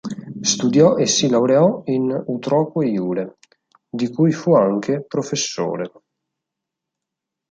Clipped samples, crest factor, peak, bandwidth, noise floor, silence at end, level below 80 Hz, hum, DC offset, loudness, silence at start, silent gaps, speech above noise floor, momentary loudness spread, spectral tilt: under 0.1%; 18 dB; -2 dBFS; 9.4 kHz; -83 dBFS; 1.65 s; -64 dBFS; none; under 0.1%; -18 LUFS; 0.05 s; none; 65 dB; 12 LU; -5 dB/octave